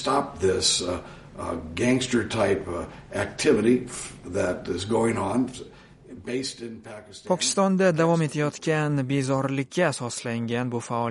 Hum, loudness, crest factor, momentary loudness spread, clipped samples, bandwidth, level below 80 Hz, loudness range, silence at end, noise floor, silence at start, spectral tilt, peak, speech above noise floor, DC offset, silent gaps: none; -25 LUFS; 18 dB; 14 LU; under 0.1%; 11.5 kHz; -52 dBFS; 4 LU; 0 s; -45 dBFS; 0 s; -4.5 dB/octave; -8 dBFS; 20 dB; under 0.1%; none